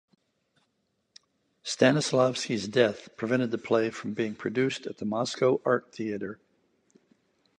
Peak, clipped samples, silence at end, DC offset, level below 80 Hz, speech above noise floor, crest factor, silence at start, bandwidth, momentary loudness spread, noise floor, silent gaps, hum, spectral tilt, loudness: -8 dBFS; under 0.1%; 1.25 s; under 0.1%; -72 dBFS; 49 dB; 22 dB; 1.65 s; 11 kHz; 11 LU; -76 dBFS; none; none; -5 dB/octave; -28 LUFS